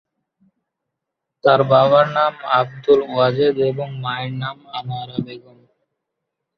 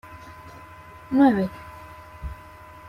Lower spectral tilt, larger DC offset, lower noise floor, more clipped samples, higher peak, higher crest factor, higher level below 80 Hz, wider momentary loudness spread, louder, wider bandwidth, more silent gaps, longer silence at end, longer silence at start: about the same, -8 dB/octave vs -8 dB/octave; neither; first, -81 dBFS vs -45 dBFS; neither; first, -2 dBFS vs -6 dBFS; about the same, 18 dB vs 20 dB; second, -60 dBFS vs -46 dBFS; second, 15 LU vs 25 LU; first, -18 LUFS vs -21 LUFS; second, 6.2 kHz vs 14 kHz; neither; first, 1.2 s vs 0.55 s; first, 1.45 s vs 0.05 s